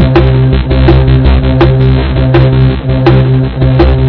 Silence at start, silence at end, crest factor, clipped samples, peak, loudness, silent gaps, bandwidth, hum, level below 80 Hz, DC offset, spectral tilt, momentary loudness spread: 0 s; 0 s; 6 dB; 4%; 0 dBFS; -8 LUFS; none; 5.4 kHz; none; -12 dBFS; under 0.1%; -10.5 dB/octave; 3 LU